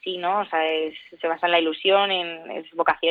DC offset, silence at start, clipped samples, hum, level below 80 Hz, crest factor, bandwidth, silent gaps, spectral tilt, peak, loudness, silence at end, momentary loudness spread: under 0.1%; 0.05 s; under 0.1%; none; -70 dBFS; 18 dB; 4.9 kHz; none; -6 dB/octave; -6 dBFS; -23 LUFS; 0 s; 11 LU